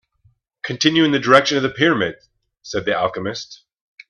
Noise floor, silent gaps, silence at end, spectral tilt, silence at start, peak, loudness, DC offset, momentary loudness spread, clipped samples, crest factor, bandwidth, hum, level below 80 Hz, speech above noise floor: -60 dBFS; none; 0.55 s; -4.5 dB/octave; 0.65 s; 0 dBFS; -18 LUFS; under 0.1%; 16 LU; under 0.1%; 20 dB; 9.8 kHz; none; -58 dBFS; 42 dB